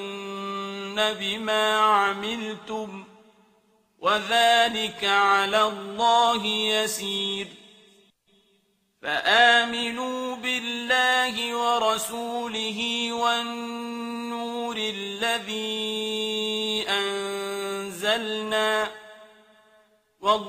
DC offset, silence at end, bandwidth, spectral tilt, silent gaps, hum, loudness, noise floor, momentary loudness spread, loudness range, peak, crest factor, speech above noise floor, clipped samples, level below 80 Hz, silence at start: under 0.1%; 0 s; 15.5 kHz; -2 dB/octave; none; none; -24 LUFS; -68 dBFS; 13 LU; 6 LU; -4 dBFS; 22 dB; 43 dB; under 0.1%; -68 dBFS; 0 s